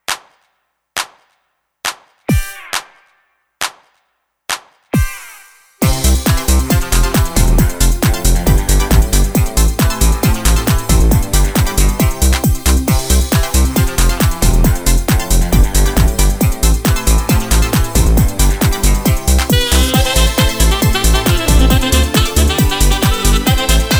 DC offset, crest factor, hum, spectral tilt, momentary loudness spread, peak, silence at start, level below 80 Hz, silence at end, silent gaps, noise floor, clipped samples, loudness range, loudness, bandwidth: under 0.1%; 12 dB; none; -4 dB/octave; 10 LU; 0 dBFS; 0.1 s; -14 dBFS; 0 s; none; -66 dBFS; under 0.1%; 10 LU; -14 LUFS; over 20 kHz